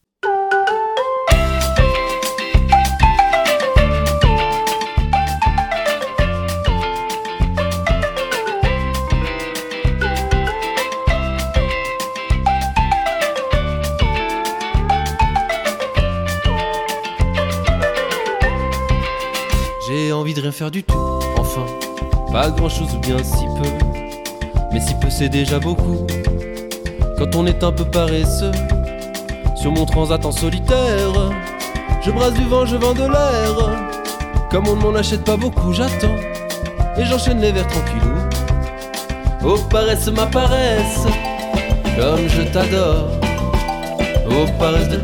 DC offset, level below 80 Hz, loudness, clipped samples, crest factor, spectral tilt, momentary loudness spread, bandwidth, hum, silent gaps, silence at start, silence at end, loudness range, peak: under 0.1%; -22 dBFS; -18 LUFS; under 0.1%; 16 dB; -5.5 dB/octave; 7 LU; 19 kHz; none; none; 0.25 s; 0 s; 4 LU; 0 dBFS